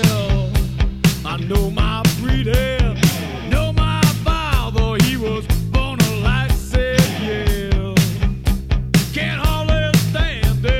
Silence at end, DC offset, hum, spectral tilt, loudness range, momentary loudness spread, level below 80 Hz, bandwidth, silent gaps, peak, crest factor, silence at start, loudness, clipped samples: 0 s; 0.6%; none; -5.5 dB/octave; 1 LU; 4 LU; -22 dBFS; 16.5 kHz; none; -2 dBFS; 16 dB; 0 s; -18 LUFS; under 0.1%